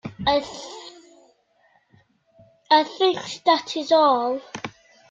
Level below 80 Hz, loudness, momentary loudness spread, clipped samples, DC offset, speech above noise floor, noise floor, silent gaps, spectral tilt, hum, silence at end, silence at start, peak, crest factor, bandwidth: -58 dBFS; -21 LUFS; 20 LU; under 0.1%; under 0.1%; 42 dB; -62 dBFS; none; -4 dB/octave; none; 0.4 s; 0.05 s; -4 dBFS; 20 dB; 9.2 kHz